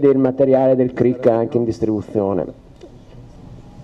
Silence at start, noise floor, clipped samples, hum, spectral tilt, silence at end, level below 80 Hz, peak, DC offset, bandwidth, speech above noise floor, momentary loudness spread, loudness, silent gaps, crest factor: 0 s; -41 dBFS; under 0.1%; none; -9.5 dB/octave; 0 s; -46 dBFS; -2 dBFS; under 0.1%; 7.8 kHz; 25 dB; 7 LU; -17 LUFS; none; 14 dB